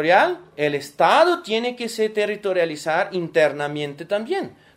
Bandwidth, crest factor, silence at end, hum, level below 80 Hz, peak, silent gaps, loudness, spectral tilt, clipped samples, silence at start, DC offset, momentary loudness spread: 16 kHz; 18 dB; 0.25 s; none; -70 dBFS; -2 dBFS; none; -21 LUFS; -4.5 dB/octave; under 0.1%; 0 s; under 0.1%; 10 LU